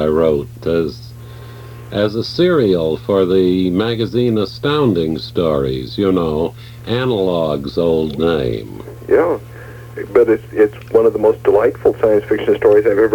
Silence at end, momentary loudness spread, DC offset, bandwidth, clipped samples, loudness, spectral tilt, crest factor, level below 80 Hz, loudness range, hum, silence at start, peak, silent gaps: 0 s; 17 LU; under 0.1%; 18 kHz; under 0.1%; -16 LUFS; -7.5 dB/octave; 14 dB; -40 dBFS; 3 LU; none; 0 s; -2 dBFS; none